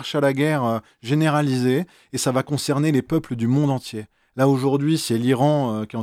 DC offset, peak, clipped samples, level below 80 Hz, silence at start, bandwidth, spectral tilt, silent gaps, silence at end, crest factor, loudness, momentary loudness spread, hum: under 0.1%; -6 dBFS; under 0.1%; -58 dBFS; 0 s; 15.5 kHz; -6 dB/octave; none; 0 s; 14 dB; -21 LUFS; 7 LU; none